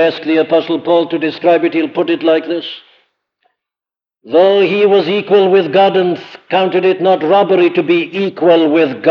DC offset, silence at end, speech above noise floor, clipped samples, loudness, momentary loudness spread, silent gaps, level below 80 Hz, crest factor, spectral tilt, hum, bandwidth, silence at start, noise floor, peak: under 0.1%; 0 s; 78 dB; under 0.1%; -12 LUFS; 7 LU; none; -70 dBFS; 12 dB; -7.5 dB/octave; none; 6.2 kHz; 0 s; -90 dBFS; 0 dBFS